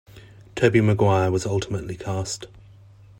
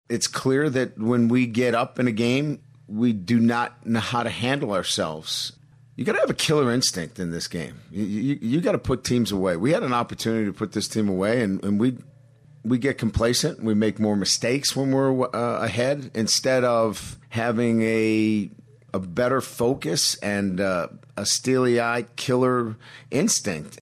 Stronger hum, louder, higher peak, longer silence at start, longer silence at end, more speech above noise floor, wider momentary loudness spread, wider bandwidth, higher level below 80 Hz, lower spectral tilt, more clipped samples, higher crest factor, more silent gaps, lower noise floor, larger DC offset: neither; about the same, -22 LUFS vs -23 LUFS; first, -4 dBFS vs -8 dBFS; about the same, 0.15 s vs 0.1 s; first, 0.75 s vs 0.05 s; about the same, 27 dB vs 29 dB; first, 14 LU vs 9 LU; second, 13 kHz vs 14.5 kHz; about the same, -52 dBFS vs -52 dBFS; first, -6 dB/octave vs -4.5 dB/octave; neither; about the same, 18 dB vs 14 dB; neither; second, -48 dBFS vs -52 dBFS; neither